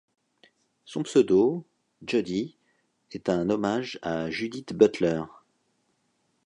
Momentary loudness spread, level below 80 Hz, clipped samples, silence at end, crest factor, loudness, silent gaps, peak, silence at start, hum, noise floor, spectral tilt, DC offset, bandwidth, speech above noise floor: 16 LU; -62 dBFS; under 0.1%; 1.2 s; 22 dB; -26 LUFS; none; -6 dBFS; 0.9 s; none; -72 dBFS; -6 dB/octave; under 0.1%; 10.5 kHz; 47 dB